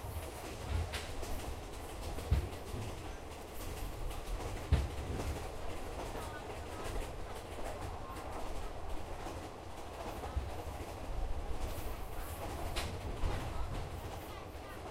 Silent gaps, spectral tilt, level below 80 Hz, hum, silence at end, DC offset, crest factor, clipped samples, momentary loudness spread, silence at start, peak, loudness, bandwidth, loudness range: none; -5 dB/octave; -42 dBFS; none; 0 s; under 0.1%; 22 dB; under 0.1%; 8 LU; 0 s; -18 dBFS; -43 LUFS; 16 kHz; 3 LU